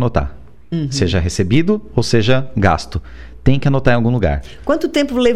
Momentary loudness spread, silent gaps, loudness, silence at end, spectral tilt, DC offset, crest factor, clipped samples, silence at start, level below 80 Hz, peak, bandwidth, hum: 9 LU; none; -16 LUFS; 0 s; -6 dB/octave; under 0.1%; 14 dB; under 0.1%; 0 s; -30 dBFS; -2 dBFS; 12.5 kHz; none